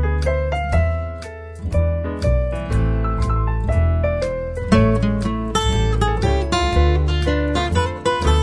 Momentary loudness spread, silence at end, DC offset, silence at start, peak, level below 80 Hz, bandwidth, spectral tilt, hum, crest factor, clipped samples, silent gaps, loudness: 6 LU; 0 s; under 0.1%; 0 s; -2 dBFS; -22 dBFS; 11 kHz; -6.5 dB/octave; none; 16 dB; under 0.1%; none; -20 LUFS